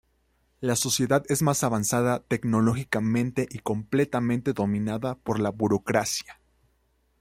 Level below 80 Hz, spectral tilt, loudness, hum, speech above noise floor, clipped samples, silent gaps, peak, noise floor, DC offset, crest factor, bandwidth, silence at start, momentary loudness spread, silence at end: -58 dBFS; -5 dB/octave; -26 LUFS; none; 43 dB; under 0.1%; none; -6 dBFS; -69 dBFS; under 0.1%; 20 dB; 16 kHz; 0.6 s; 6 LU; 0.9 s